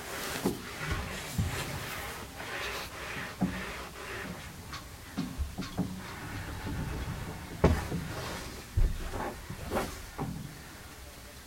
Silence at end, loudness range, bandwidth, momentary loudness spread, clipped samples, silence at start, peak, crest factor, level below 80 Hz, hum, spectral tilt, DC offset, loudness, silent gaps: 0 s; 4 LU; 16.5 kHz; 9 LU; under 0.1%; 0 s; -10 dBFS; 24 dB; -42 dBFS; none; -5 dB/octave; under 0.1%; -36 LUFS; none